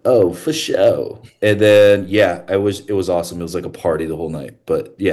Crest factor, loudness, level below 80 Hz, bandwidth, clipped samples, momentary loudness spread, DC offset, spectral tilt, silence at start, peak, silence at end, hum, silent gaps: 14 dB; -16 LUFS; -48 dBFS; 12.5 kHz; under 0.1%; 14 LU; under 0.1%; -5.5 dB/octave; 0.05 s; -2 dBFS; 0 s; none; none